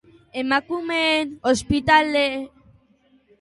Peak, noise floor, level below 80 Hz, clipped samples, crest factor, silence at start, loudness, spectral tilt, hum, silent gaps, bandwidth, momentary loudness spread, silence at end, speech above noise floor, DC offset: -2 dBFS; -59 dBFS; -46 dBFS; under 0.1%; 20 dB; 0.35 s; -20 LUFS; -4 dB/octave; none; none; 11.5 kHz; 14 LU; 0.95 s; 39 dB; under 0.1%